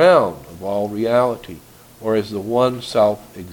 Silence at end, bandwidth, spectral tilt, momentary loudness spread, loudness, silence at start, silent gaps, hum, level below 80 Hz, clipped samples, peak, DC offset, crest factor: 0 s; 19 kHz; -6 dB/octave; 13 LU; -19 LUFS; 0 s; none; none; -52 dBFS; under 0.1%; 0 dBFS; under 0.1%; 18 dB